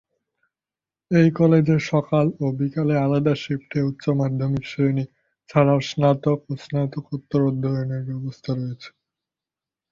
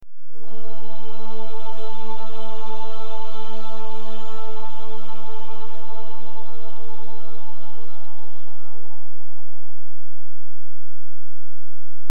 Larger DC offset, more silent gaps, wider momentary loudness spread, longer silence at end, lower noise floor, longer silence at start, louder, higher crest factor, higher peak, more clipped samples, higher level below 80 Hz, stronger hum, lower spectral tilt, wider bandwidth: second, under 0.1% vs 50%; neither; second, 10 LU vs 22 LU; first, 1.05 s vs 0 s; first, under -90 dBFS vs -60 dBFS; first, 1.1 s vs 0 s; first, -22 LUFS vs -39 LUFS; about the same, 18 dB vs 18 dB; about the same, -4 dBFS vs -6 dBFS; neither; first, -56 dBFS vs -66 dBFS; neither; about the same, -8 dB/octave vs -7 dB/octave; second, 7.4 kHz vs 18 kHz